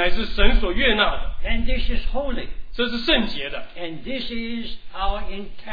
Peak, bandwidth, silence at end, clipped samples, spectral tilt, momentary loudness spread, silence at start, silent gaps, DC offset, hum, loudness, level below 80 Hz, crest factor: 0 dBFS; 5 kHz; 0 s; under 0.1%; -6.5 dB/octave; 13 LU; 0 s; none; 3%; none; -24 LUFS; -24 dBFS; 18 dB